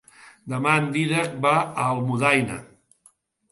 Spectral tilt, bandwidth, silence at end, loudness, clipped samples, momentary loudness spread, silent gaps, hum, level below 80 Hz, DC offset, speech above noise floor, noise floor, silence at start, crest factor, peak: -5.5 dB/octave; 11.5 kHz; 0.9 s; -22 LUFS; under 0.1%; 12 LU; none; none; -62 dBFS; under 0.1%; 38 dB; -60 dBFS; 0.25 s; 20 dB; -4 dBFS